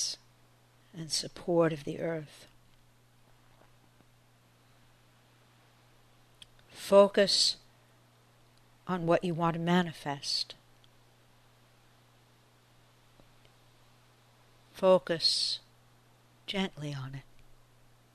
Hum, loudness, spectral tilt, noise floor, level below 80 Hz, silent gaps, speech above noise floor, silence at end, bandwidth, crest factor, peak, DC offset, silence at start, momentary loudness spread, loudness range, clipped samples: 60 Hz at -65 dBFS; -29 LUFS; -4 dB/octave; -63 dBFS; -64 dBFS; none; 35 dB; 0.95 s; 13.5 kHz; 24 dB; -10 dBFS; under 0.1%; 0 s; 23 LU; 11 LU; under 0.1%